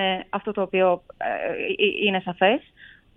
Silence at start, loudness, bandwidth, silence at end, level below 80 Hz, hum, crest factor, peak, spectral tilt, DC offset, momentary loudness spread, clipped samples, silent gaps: 0 s; -23 LUFS; 3.9 kHz; 0.3 s; -60 dBFS; none; 18 dB; -6 dBFS; -8 dB/octave; under 0.1%; 7 LU; under 0.1%; none